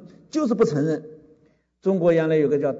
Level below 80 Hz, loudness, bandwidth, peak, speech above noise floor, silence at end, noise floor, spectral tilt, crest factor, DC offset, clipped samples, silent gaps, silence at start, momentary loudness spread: -64 dBFS; -22 LUFS; 7.8 kHz; -10 dBFS; 39 dB; 0 s; -60 dBFS; -7.5 dB/octave; 14 dB; under 0.1%; under 0.1%; none; 0.35 s; 9 LU